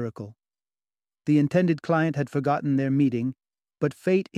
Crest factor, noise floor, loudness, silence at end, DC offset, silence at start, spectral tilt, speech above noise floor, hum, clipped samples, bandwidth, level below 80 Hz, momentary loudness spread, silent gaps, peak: 16 dB; under -90 dBFS; -25 LUFS; 0 s; under 0.1%; 0 s; -8.5 dB/octave; over 66 dB; none; under 0.1%; 11 kHz; -68 dBFS; 12 LU; none; -8 dBFS